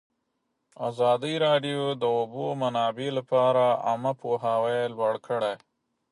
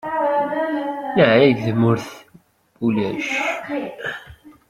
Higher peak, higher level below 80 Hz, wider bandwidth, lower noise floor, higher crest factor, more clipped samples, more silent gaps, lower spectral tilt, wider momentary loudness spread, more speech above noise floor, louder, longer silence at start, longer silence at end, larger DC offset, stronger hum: second, -10 dBFS vs -2 dBFS; second, -76 dBFS vs -58 dBFS; second, 11.5 kHz vs 15 kHz; first, -78 dBFS vs -53 dBFS; about the same, 16 dB vs 18 dB; neither; neither; about the same, -6 dB/octave vs -6.5 dB/octave; second, 8 LU vs 14 LU; first, 52 dB vs 34 dB; second, -26 LUFS vs -20 LUFS; first, 0.8 s vs 0.05 s; first, 0.55 s vs 0.2 s; neither; neither